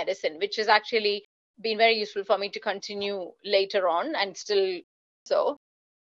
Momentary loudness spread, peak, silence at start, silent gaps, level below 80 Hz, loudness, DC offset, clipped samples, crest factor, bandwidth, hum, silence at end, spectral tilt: 10 LU; -6 dBFS; 0 s; 1.25-1.54 s, 4.84-5.26 s; -80 dBFS; -26 LUFS; under 0.1%; under 0.1%; 20 dB; 7.8 kHz; none; 0.5 s; -2.5 dB/octave